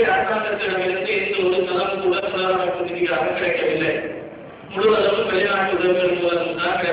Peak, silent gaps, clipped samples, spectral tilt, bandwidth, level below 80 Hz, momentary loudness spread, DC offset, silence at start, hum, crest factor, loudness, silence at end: -6 dBFS; none; under 0.1%; -8.5 dB/octave; 4 kHz; -54 dBFS; 5 LU; under 0.1%; 0 s; none; 14 dB; -20 LUFS; 0 s